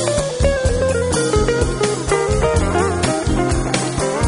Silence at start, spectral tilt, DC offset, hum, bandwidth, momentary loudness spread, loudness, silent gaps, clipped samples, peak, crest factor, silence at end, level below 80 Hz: 0 s; -5 dB/octave; under 0.1%; none; 11 kHz; 2 LU; -18 LUFS; none; under 0.1%; -2 dBFS; 16 dB; 0 s; -26 dBFS